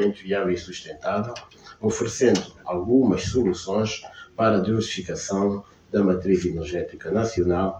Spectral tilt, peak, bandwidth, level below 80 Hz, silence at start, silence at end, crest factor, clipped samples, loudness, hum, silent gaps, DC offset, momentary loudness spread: -5.5 dB/octave; -6 dBFS; 9.6 kHz; -48 dBFS; 0 s; 0 s; 16 dB; under 0.1%; -24 LUFS; none; none; under 0.1%; 10 LU